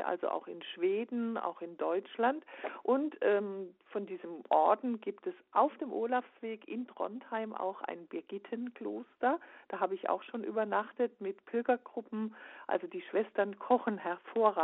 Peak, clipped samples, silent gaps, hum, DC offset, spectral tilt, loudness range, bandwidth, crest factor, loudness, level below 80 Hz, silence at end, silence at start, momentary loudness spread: -14 dBFS; under 0.1%; none; none; under 0.1%; -3.5 dB/octave; 5 LU; 4.1 kHz; 20 dB; -35 LUFS; -90 dBFS; 0 s; 0 s; 12 LU